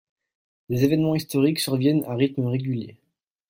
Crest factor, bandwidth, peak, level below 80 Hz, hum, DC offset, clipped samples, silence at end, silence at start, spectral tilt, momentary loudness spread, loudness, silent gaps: 16 dB; 16.5 kHz; -8 dBFS; -60 dBFS; none; under 0.1%; under 0.1%; 0.6 s; 0.7 s; -6.5 dB/octave; 9 LU; -23 LUFS; none